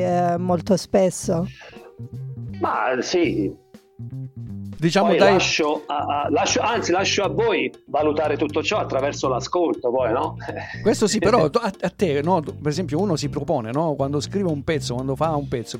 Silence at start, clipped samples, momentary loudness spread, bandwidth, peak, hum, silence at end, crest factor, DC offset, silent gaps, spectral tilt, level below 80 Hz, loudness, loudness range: 0 s; under 0.1%; 15 LU; 16 kHz; -4 dBFS; none; 0 s; 18 dB; under 0.1%; none; -5 dB/octave; -48 dBFS; -21 LUFS; 4 LU